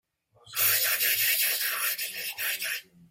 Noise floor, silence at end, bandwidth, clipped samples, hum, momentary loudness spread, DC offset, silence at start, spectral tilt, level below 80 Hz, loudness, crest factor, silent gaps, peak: -56 dBFS; 0.3 s; 17 kHz; under 0.1%; none; 10 LU; under 0.1%; 0.45 s; 2 dB/octave; -76 dBFS; -25 LUFS; 18 dB; none; -10 dBFS